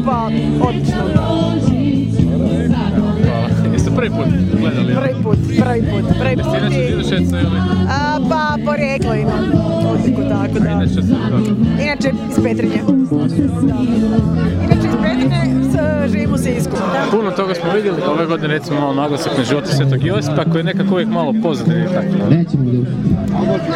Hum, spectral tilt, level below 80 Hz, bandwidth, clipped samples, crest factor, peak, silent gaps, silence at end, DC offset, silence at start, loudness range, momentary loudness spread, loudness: none; -7.5 dB/octave; -32 dBFS; 13 kHz; under 0.1%; 14 dB; 0 dBFS; none; 0 s; under 0.1%; 0 s; 1 LU; 2 LU; -15 LUFS